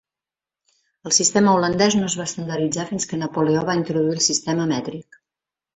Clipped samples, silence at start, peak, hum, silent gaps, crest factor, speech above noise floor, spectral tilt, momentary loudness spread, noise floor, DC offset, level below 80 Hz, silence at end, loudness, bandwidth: under 0.1%; 1.05 s; -4 dBFS; none; none; 18 dB; 69 dB; -3.5 dB/octave; 10 LU; -90 dBFS; under 0.1%; -58 dBFS; 0.75 s; -20 LUFS; 8.4 kHz